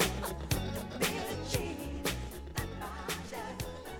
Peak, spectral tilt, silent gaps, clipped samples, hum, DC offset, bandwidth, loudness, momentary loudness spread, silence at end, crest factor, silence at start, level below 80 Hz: -14 dBFS; -4 dB/octave; none; under 0.1%; none; under 0.1%; over 20 kHz; -37 LUFS; 7 LU; 0 s; 22 dB; 0 s; -46 dBFS